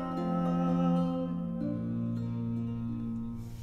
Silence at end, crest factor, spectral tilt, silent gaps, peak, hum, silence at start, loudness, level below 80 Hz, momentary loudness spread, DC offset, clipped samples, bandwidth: 0 s; 14 dB; -9.5 dB/octave; none; -18 dBFS; none; 0 s; -33 LUFS; -52 dBFS; 8 LU; under 0.1%; under 0.1%; 6.2 kHz